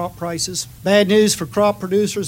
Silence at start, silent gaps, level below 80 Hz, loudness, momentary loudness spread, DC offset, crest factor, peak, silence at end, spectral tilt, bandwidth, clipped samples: 0 s; none; -50 dBFS; -17 LUFS; 9 LU; under 0.1%; 18 dB; 0 dBFS; 0 s; -4 dB/octave; 16.5 kHz; under 0.1%